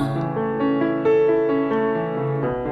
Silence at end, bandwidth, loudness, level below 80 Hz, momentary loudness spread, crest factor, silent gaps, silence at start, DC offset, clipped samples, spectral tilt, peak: 0 s; 5 kHz; -21 LUFS; -50 dBFS; 6 LU; 12 dB; none; 0 s; under 0.1%; under 0.1%; -9 dB/octave; -8 dBFS